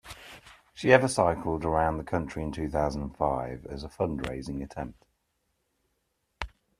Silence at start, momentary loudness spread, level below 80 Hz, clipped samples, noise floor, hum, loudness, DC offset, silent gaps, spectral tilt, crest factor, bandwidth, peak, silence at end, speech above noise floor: 0.05 s; 19 LU; -48 dBFS; under 0.1%; -77 dBFS; none; -28 LUFS; under 0.1%; none; -5.5 dB/octave; 26 dB; 14 kHz; -4 dBFS; 0.3 s; 49 dB